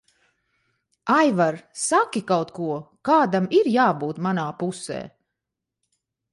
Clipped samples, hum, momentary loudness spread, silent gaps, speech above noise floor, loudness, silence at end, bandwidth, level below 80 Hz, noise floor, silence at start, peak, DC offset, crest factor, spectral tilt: under 0.1%; none; 12 LU; none; 63 dB; -22 LUFS; 1.25 s; 11.5 kHz; -68 dBFS; -84 dBFS; 1.05 s; -6 dBFS; under 0.1%; 18 dB; -5 dB/octave